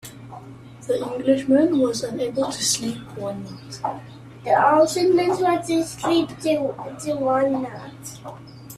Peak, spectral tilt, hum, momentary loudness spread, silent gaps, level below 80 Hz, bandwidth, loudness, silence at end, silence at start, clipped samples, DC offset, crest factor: -4 dBFS; -4 dB/octave; none; 21 LU; none; -58 dBFS; 14.5 kHz; -21 LUFS; 0 s; 0.05 s; under 0.1%; under 0.1%; 18 dB